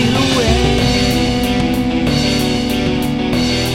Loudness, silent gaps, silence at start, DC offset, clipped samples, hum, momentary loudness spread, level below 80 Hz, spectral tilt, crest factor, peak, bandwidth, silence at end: -15 LUFS; none; 0 s; 0.5%; under 0.1%; none; 3 LU; -26 dBFS; -5 dB/octave; 14 dB; 0 dBFS; 16.5 kHz; 0 s